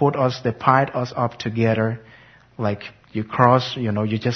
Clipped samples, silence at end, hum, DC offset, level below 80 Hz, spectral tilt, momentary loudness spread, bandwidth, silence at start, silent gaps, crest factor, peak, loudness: under 0.1%; 0 s; none; under 0.1%; -56 dBFS; -7.5 dB/octave; 12 LU; 6.4 kHz; 0 s; none; 20 dB; 0 dBFS; -21 LUFS